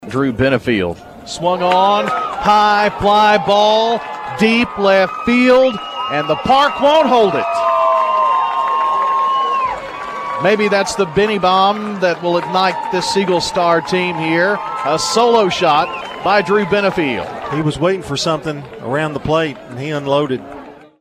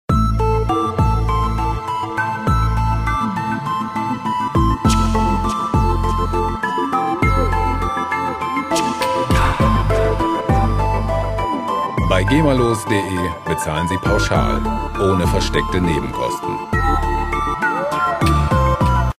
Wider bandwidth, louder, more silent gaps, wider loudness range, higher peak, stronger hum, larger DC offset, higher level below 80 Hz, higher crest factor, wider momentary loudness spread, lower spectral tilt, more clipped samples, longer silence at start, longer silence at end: about the same, 14.5 kHz vs 15.5 kHz; first, -15 LUFS vs -18 LUFS; neither; first, 4 LU vs 1 LU; about the same, 0 dBFS vs 0 dBFS; neither; neither; second, -46 dBFS vs -24 dBFS; about the same, 14 dB vs 16 dB; first, 10 LU vs 6 LU; second, -4.5 dB/octave vs -6 dB/octave; neither; about the same, 0 s vs 0.1 s; first, 0.25 s vs 0.05 s